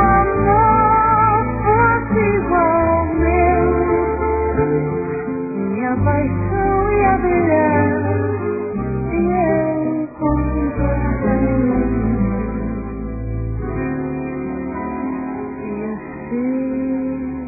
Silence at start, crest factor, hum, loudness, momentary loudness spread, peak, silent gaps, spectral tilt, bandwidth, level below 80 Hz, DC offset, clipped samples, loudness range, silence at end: 0 s; 16 dB; none; -18 LUFS; 11 LU; -2 dBFS; none; -15 dB/octave; 2.7 kHz; -28 dBFS; under 0.1%; under 0.1%; 9 LU; 0 s